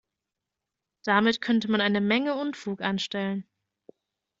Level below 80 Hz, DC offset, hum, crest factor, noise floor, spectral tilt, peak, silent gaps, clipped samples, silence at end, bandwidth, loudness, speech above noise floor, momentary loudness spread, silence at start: -70 dBFS; under 0.1%; none; 22 dB; -86 dBFS; -5.5 dB/octave; -6 dBFS; none; under 0.1%; 1 s; 7.6 kHz; -26 LUFS; 61 dB; 9 LU; 1.05 s